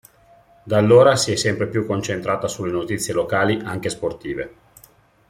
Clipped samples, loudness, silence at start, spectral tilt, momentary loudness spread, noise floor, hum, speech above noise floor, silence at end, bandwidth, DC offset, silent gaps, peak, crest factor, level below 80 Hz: under 0.1%; -20 LUFS; 0.65 s; -5 dB/octave; 14 LU; -53 dBFS; none; 33 dB; 0.8 s; 16 kHz; under 0.1%; none; -2 dBFS; 18 dB; -54 dBFS